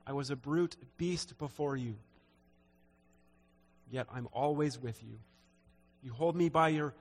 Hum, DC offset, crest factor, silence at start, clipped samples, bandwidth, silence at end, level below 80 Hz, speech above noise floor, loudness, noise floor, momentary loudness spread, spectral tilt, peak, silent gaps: none; under 0.1%; 22 dB; 0.05 s; under 0.1%; 13.5 kHz; 0.05 s; -68 dBFS; 33 dB; -35 LUFS; -68 dBFS; 19 LU; -6 dB/octave; -16 dBFS; none